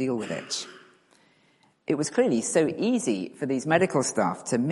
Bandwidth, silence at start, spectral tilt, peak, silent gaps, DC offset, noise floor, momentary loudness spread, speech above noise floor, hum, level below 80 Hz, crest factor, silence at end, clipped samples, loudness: 11.5 kHz; 0 s; -4.5 dB/octave; -6 dBFS; none; under 0.1%; -64 dBFS; 9 LU; 38 dB; none; -70 dBFS; 22 dB; 0 s; under 0.1%; -26 LUFS